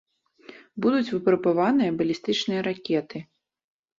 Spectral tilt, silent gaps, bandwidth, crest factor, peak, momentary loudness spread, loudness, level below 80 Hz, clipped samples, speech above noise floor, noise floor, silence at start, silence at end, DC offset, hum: -6 dB/octave; none; 7.6 kHz; 16 dB; -10 dBFS; 10 LU; -24 LUFS; -66 dBFS; under 0.1%; 27 dB; -50 dBFS; 0.75 s; 0.75 s; under 0.1%; none